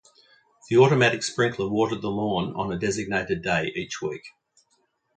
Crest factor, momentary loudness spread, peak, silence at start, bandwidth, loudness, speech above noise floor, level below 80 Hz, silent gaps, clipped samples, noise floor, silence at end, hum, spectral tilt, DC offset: 22 dB; 12 LU; -4 dBFS; 0.7 s; 9.4 kHz; -24 LUFS; 46 dB; -56 dBFS; none; under 0.1%; -70 dBFS; 0.9 s; none; -5 dB/octave; under 0.1%